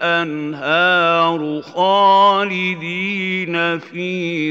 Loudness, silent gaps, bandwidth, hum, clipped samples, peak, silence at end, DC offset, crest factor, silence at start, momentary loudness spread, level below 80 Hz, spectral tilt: -16 LUFS; none; 7.8 kHz; none; under 0.1%; -2 dBFS; 0 s; under 0.1%; 14 dB; 0 s; 11 LU; -76 dBFS; -5.5 dB/octave